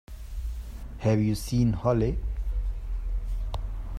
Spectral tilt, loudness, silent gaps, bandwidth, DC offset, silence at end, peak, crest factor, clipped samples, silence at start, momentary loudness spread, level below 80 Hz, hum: -7.5 dB/octave; -29 LUFS; none; 14 kHz; under 0.1%; 0 s; -10 dBFS; 18 dB; under 0.1%; 0.1 s; 13 LU; -32 dBFS; none